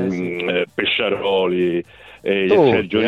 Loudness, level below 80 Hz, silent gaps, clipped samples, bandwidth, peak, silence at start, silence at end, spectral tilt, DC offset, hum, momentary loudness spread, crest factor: -18 LUFS; -54 dBFS; none; under 0.1%; 7.2 kHz; -4 dBFS; 0 s; 0 s; -7 dB/octave; under 0.1%; none; 8 LU; 16 dB